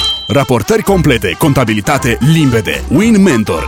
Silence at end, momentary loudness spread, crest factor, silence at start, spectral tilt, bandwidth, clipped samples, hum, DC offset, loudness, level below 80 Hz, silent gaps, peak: 0 s; 4 LU; 10 dB; 0 s; -5.5 dB/octave; 18 kHz; under 0.1%; none; under 0.1%; -11 LUFS; -28 dBFS; none; 0 dBFS